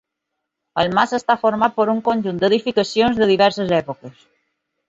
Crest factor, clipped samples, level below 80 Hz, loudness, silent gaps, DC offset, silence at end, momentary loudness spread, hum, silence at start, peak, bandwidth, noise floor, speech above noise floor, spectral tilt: 18 dB; under 0.1%; -54 dBFS; -18 LUFS; none; under 0.1%; 0.8 s; 6 LU; none; 0.75 s; -2 dBFS; 7.8 kHz; -79 dBFS; 61 dB; -5.5 dB/octave